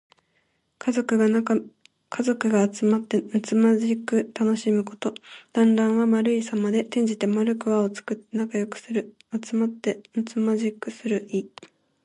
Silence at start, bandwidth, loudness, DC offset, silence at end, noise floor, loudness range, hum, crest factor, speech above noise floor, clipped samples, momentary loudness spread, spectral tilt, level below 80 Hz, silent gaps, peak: 0.85 s; 10.5 kHz; -24 LUFS; under 0.1%; 0.55 s; -70 dBFS; 5 LU; none; 16 dB; 47 dB; under 0.1%; 10 LU; -6 dB/octave; -72 dBFS; none; -8 dBFS